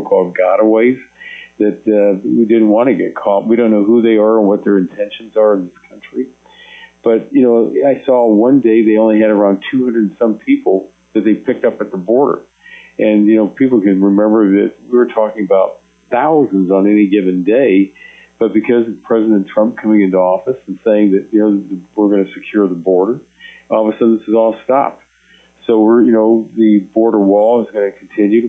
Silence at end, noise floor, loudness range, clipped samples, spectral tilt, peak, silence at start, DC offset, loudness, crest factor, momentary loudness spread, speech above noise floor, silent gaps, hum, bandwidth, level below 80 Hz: 0 s; -47 dBFS; 3 LU; under 0.1%; -9.5 dB/octave; 0 dBFS; 0 s; under 0.1%; -11 LUFS; 10 dB; 9 LU; 37 dB; none; none; 3.8 kHz; -60 dBFS